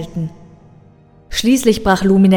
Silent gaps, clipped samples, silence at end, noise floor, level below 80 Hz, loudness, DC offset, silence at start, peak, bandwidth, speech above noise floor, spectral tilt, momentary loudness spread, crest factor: none; under 0.1%; 0 s; -46 dBFS; -36 dBFS; -15 LUFS; under 0.1%; 0 s; 0 dBFS; 17.5 kHz; 33 dB; -5.5 dB/octave; 13 LU; 16 dB